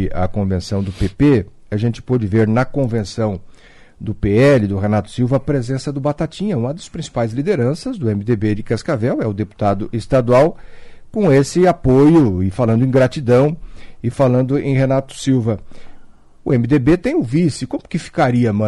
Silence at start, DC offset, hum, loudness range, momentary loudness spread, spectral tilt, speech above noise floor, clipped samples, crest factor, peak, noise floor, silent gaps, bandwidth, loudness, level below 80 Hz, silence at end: 0 s; under 0.1%; none; 5 LU; 10 LU; -7.5 dB/octave; 22 dB; under 0.1%; 12 dB; -4 dBFS; -38 dBFS; none; 11.5 kHz; -17 LUFS; -36 dBFS; 0 s